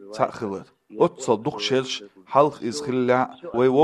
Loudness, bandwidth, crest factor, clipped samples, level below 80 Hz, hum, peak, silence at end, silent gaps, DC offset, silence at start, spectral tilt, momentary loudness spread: -23 LUFS; 11.5 kHz; 20 dB; under 0.1%; -66 dBFS; none; -4 dBFS; 0 s; none; under 0.1%; 0 s; -5 dB/octave; 11 LU